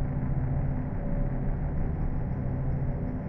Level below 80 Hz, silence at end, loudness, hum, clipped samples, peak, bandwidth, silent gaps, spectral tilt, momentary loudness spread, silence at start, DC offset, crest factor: -32 dBFS; 0 s; -32 LUFS; none; under 0.1%; -18 dBFS; 2.8 kHz; none; -12.5 dB/octave; 2 LU; 0 s; under 0.1%; 12 dB